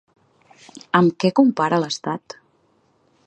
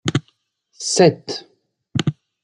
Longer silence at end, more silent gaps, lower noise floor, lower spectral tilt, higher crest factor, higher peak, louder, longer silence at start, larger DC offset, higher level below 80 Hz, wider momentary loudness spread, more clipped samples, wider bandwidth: first, 1.1 s vs 0.3 s; neither; about the same, -62 dBFS vs -64 dBFS; first, -6 dB/octave vs -4.5 dB/octave; about the same, 20 dB vs 20 dB; about the same, 0 dBFS vs -2 dBFS; about the same, -19 LUFS vs -20 LUFS; first, 0.75 s vs 0.05 s; neither; second, -68 dBFS vs -56 dBFS; first, 18 LU vs 15 LU; neither; second, 8.8 kHz vs 11.5 kHz